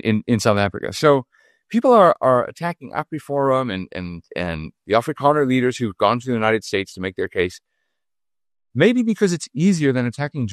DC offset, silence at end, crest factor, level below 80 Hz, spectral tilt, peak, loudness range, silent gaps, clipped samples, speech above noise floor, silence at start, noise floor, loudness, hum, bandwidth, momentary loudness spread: under 0.1%; 0 s; 18 dB; -54 dBFS; -6 dB/octave; -2 dBFS; 4 LU; none; under 0.1%; over 71 dB; 0.05 s; under -90 dBFS; -19 LUFS; none; 13 kHz; 12 LU